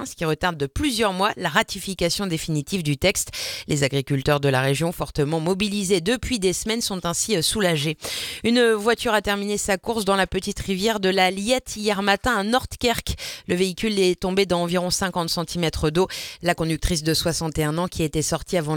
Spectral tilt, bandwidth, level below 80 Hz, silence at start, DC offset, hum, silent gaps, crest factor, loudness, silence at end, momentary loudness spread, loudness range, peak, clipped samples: -4 dB/octave; 19 kHz; -40 dBFS; 0 s; under 0.1%; none; none; 20 dB; -22 LUFS; 0 s; 5 LU; 2 LU; -2 dBFS; under 0.1%